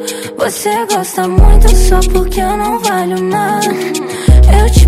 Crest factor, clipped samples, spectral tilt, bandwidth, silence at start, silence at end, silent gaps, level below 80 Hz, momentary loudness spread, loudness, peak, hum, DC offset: 8 dB; 1%; -5.5 dB/octave; 15.5 kHz; 0 s; 0 s; none; -10 dBFS; 8 LU; -12 LUFS; 0 dBFS; none; under 0.1%